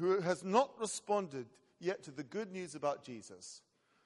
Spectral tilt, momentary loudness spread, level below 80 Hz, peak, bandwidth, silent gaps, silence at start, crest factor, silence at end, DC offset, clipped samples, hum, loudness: -4.5 dB/octave; 18 LU; -84 dBFS; -16 dBFS; 11.5 kHz; none; 0 s; 22 dB; 0.5 s; under 0.1%; under 0.1%; none; -38 LUFS